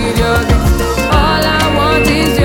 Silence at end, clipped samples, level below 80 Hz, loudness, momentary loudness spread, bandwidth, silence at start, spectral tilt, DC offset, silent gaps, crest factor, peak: 0 s; under 0.1%; -18 dBFS; -11 LUFS; 2 LU; 18 kHz; 0 s; -5 dB/octave; under 0.1%; none; 10 dB; 0 dBFS